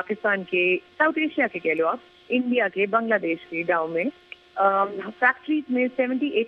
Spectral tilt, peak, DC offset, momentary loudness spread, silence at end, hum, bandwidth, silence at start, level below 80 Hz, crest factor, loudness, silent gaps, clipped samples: -7.5 dB/octave; -6 dBFS; under 0.1%; 6 LU; 0 s; none; 5.6 kHz; 0 s; -72 dBFS; 18 dB; -23 LUFS; none; under 0.1%